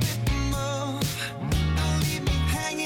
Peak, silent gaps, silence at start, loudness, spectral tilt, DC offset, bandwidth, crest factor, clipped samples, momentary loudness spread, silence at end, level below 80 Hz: -14 dBFS; none; 0 s; -27 LUFS; -4.5 dB/octave; under 0.1%; 17.5 kHz; 12 dB; under 0.1%; 4 LU; 0 s; -32 dBFS